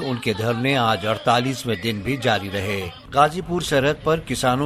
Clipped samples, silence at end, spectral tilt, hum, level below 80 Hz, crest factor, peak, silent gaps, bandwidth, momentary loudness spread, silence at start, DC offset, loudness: under 0.1%; 0 s; -5 dB/octave; none; -46 dBFS; 18 dB; -2 dBFS; none; 15 kHz; 6 LU; 0 s; under 0.1%; -21 LUFS